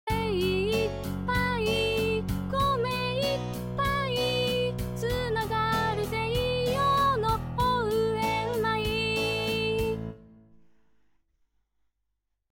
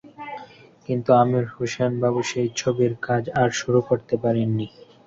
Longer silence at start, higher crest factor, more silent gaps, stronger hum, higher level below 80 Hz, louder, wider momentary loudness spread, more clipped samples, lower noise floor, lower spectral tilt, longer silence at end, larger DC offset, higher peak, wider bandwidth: about the same, 0.05 s vs 0.05 s; about the same, 14 dB vs 18 dB; neither; neither; first, -44 dBFS vs -58 dBFS; second, -27 LUFS vs -22 LUFS; second, 5 LU vs 18 LU; neither; first, -81 dBFS vs -44 dBFS; about the same, -5.5 dB/octave vs -6 dB/octave; first, 2 s vs 0.4 s; neither; second, -14 dBFS vs -4 dBFS; first, 17 kHz vs 7.8 kHz